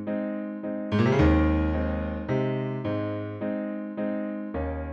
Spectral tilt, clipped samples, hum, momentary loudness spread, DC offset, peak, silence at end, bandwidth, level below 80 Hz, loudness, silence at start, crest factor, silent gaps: -9 dB/octave; under 0.1%; none; 11 LU; under 0.1%; -10 dBFS; 0 s; 6.8 kHz; -36 dBFS; -27 LUFS; 0 s; 16 dB; none